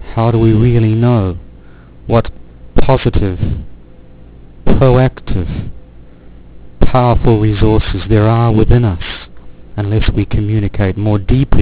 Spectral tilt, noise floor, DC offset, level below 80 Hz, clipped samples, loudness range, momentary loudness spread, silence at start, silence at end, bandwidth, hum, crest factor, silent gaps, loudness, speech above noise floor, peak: -12 dB/octave; -36 dBFS; under 0.1%; -22 dBFS; 1%; 5 LU; 13 LU; 0 s; 0 s; 4 kHz; none; 12 dB; none; -13 LUFS; 26 dB; 0 dBFS